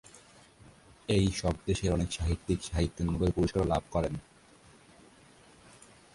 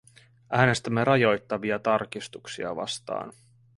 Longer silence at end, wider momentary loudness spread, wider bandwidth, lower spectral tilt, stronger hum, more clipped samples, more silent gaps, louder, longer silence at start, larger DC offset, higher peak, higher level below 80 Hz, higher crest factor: first, 1.95 s vs 0.45 s; second, 5 LU vs 14 LU; about the same, 11.5 kHz vs 11.5 kHz; about the same, -6 dB/octave vs -5.5 dB/octave; neither; neither; neither; second, -31 LUFS vs -26 LUFS; first, 1.1 s vs 0.5 s; neither; second, -14 dBFS vs -6 dBFS; first, -42 dBFS vs -60 dBFS; about the same, 18 dB vs 22 dB